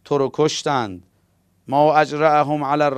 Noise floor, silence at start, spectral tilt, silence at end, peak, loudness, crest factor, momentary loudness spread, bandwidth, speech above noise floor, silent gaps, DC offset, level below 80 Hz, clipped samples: -62 dBFS; 0.1 s; -5 dB/octave; 0 s; -2 dBFS; -18 LUFS; 18 dB; 7 LU; 12.5 kHz; 44 dB; none; under 0.1%; -60 dBFS; under 0.1%